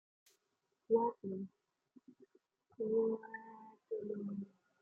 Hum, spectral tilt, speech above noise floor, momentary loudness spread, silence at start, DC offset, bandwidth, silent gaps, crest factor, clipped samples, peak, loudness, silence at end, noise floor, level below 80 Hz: none; -9.5 dB/octave; 46 dB; 18 LU; 0.9 s; under 0.1%; 2.1 kHz; none; 22 dB; under 0.1%; -20 dBFS; -39 LUFS; 0.35 s; -85 dBFS; -88 dBFS